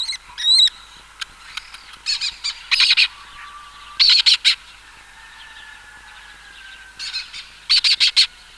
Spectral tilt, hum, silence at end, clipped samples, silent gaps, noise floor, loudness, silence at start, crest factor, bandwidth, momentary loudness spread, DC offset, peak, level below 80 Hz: 3.5 dB/octave; none; 0.3 s; under 0.1%; none; -44 dBFS; -15 LUFS; 0 s; 18 dB; 14 kHz; 21 LU; under 0.1%; -2 dBFS; -54 dBFS